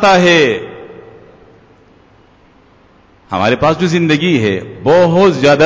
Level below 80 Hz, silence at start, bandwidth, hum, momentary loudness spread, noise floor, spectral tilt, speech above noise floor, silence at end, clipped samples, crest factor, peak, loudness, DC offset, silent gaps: -44 dBFS; 0 s; 8 kHz; none; 13 LU; -47 dBFS; -5.5 dB/octave; 36 dB; 0 s; under 0.1%; 12 dB; 0 dBFS; -11 LUFS; under 0.1%; none